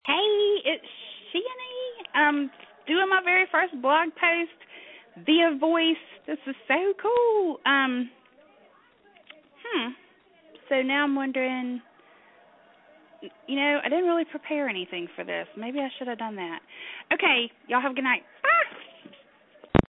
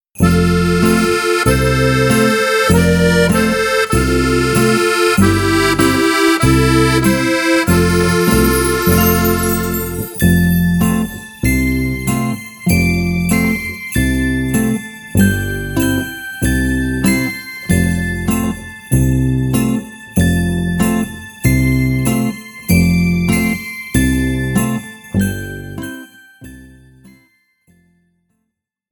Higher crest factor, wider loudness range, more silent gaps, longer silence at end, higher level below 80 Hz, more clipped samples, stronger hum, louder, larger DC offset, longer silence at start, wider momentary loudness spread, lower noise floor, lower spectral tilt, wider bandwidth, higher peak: first, 26 dB vs 14 dB; about the same, 6 LU vs 5 LU; neither; second, 0.1 s vs 1.85 s; second, -54 dBFS vs -26 dBFS; neither; neither; second, -25 LUFS vs -14 LUFS; neither; about the same, 0.05 s vs 0.15 s; first, 14 LU vs 8 LU; second, -59 dBFS vs -74 dBFS; first, -8 dB/octave vs -5.5 dB/octave; second, 4.1 kHz vs 19.5 kHz; about the same, 0 dBFS vs 0 dBFS